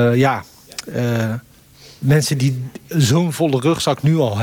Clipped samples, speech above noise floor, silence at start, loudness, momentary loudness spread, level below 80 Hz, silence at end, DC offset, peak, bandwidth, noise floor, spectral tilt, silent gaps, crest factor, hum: under 0.1%; 28 dB; 0 s; -18 LUFS; 12 LU; -52 dBFS; 0 s; under 0.1%; -4 dBFS; 18.5 kHz; -45 dBFS; -6 dB/octave; none; 14 dB; none